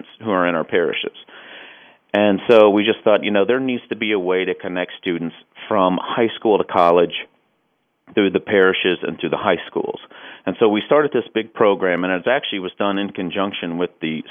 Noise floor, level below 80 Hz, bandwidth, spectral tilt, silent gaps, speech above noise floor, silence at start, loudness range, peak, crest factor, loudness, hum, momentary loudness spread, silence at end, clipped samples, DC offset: -68 dBFS; -66 dBFS; 5.6 kHz; -7.5 dB/octave; none; 49 dB; 0.2 s; 3 LU; 0 dBFS; 18 dB; -18 LUFS; none; 13 LU; 0 s; under 0.1%; under 0.1%